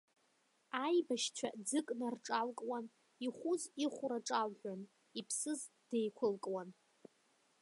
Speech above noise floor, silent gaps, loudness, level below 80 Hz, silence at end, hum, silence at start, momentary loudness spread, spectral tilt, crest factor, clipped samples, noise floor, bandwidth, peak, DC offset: 37 dB; none; -40 LUFS; under -90 dBFS; 0.9 s; none; 0.75 s; 11 LU; -3 dB/octave; 18 dB; under 0.1%; -77 dBFS; 11.5 kHz; -22 dBFS; under 0.1%